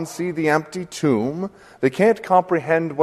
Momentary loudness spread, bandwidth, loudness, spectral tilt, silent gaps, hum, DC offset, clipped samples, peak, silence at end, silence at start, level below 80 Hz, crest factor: 10 LU; 13.5 kHz; -20 LUFS; -6 dB/octave; none; none; under 0.1%; under 0.1%; -2 dBFS; 0 s; 0 s; -60 dBFS; 18 dB